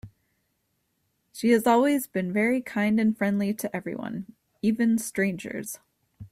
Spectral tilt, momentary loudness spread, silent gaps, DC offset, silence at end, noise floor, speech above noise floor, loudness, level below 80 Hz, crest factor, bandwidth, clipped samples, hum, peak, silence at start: -5.5 dB/octave; 15 LU; none; under 0.1%; 0.05 s; -75 dBFS; 50 dB; -25 LUFS; -64 dBFS; 18 dB; 16 kHz; under 0.1%; none; -10 dBFS; 0.05 s